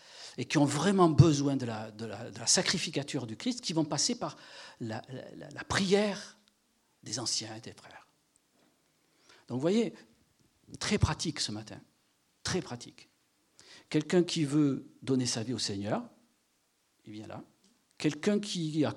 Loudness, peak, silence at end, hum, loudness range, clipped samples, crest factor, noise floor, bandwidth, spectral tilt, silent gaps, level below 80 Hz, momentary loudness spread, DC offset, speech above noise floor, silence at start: -31 LUFS; -8 dBFS; 0 s; none; 8 LU; under 0.1%; 26 dB; -74 dBFS; 12.5 kHz; -4.5 dB/octave; none; -58 dBFS; 20 LU; under 0.1%; 43 dB; 0.1 s